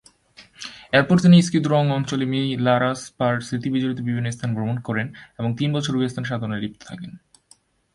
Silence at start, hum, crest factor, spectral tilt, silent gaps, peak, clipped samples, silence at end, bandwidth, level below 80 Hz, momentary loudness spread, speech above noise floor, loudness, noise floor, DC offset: 0.4 s; none; 20 dB; -6.5 dB/octave; none; -2 dBFS; under 0.1%; 0.8 s; 11.5 kHz; -58 dBFS; 18 LU; 37 dB; -21 LUFS; -57 dBFS; under 0.1%